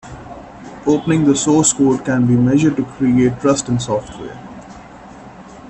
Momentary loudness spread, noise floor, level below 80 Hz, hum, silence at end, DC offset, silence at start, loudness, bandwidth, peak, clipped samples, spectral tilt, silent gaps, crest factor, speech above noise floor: 22 LU; -37 dBFS; -46 dBFS; none; 0 s; under 0.1%; 0.05 s; -15 LUFS; 10.5 kHz; -2 dBFS; under 0.1%; -5.5 dB/octave; none; 14 dB; 22 dB